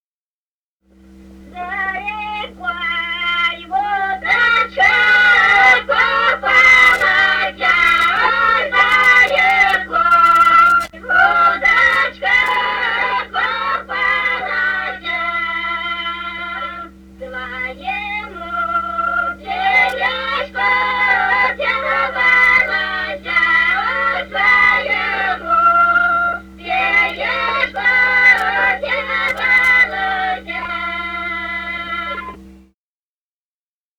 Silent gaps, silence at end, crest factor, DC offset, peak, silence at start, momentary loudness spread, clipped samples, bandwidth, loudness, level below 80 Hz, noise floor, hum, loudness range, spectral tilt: none; 1.45 s; 16 dB; under 0.1%; 0 dBFS; 1.3 s; 14 LU; under 0.1%; 19 kHz; -14 LUFS; -44 dBFS; under -90 dBFS; none; 11 LU; -2.5 dB/octave